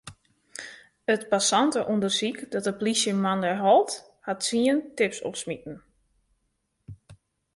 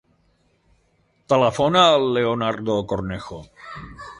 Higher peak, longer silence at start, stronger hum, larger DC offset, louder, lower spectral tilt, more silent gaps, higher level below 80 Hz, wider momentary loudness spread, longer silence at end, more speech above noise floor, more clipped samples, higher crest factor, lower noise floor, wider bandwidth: second, -8 dBFS vs -2 dBFS; second, 0.05 s vs 1.3 s; neither; neither; second, -25 LUFS vs -19 LUFS; second, -3.5 dB/octave vs -5 dB/octave; neither; second, -66 dBFS vs -50 dBFS; second, 19 LU vs 22 LU; first, 0.4 s vs 0.05 s; first, 50 dB vs 43 dB; neither; about the same, 18 dB vs 20 dB; first, -75 dBFS vs -64 dBFS; about the same, 11.5 kHz vs 11.5 kHz